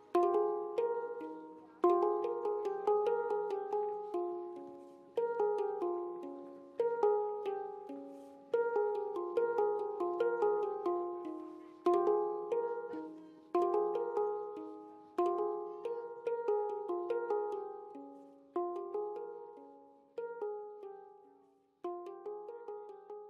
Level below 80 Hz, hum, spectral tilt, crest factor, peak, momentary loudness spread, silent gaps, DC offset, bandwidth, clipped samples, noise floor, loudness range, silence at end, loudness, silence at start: under -90 dBFS; none; -6.5 dB/octave; 20 dB; -18 dBFS; 17 LU; none; under 0.1%; 6.6 kHz; under 0.1%; -68 dBFS; 9 LU; 0 s; -36 LUFS; 0 s